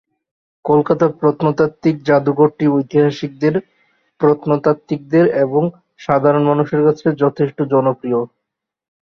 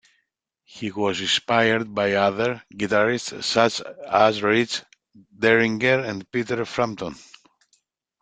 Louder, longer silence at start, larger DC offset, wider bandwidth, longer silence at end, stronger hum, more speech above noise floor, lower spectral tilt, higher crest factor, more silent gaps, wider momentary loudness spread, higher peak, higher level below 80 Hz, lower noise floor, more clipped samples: first, -16 LUFS vs -22 LUFS; about the same, 0.65 s vs 0.75 s; neither; second, 6.4 kHz vs 9.4 kHz; second, 0.85 s vs 1.05 s; neither; first, 65 dB vs 52 dB; first, -9 dB/octave vs -4 dB/octave; second, 14 dB vs 22 dB; neither; second, 7 LU vs 11 LU; about the same, -2 dBFS vs -2 dBFS; about the same, -58 dBFS vs -62 dBFS; first, -79 dBFS vs -75 dBFS; neither